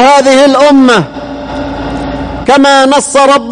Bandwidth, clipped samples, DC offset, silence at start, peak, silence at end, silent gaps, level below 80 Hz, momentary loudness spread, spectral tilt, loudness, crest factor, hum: 10.5 kHz; 0.8%; under 0.1%; 0 s; 0 dBFS; 0 s; none; -30 dBFS; 14 LU; -4 dB/octave; -6 LUFS; 6 dB; none